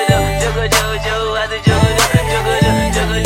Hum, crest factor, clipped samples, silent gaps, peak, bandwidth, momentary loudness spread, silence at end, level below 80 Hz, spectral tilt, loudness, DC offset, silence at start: none; 14 dB; under 0.1%; none; 0 dBFS; 16.5 kHz; 5 LU; 0 s; -24 dBFS; -4.5 dB/octave; -14 LUFS; under 0.1%; 0 s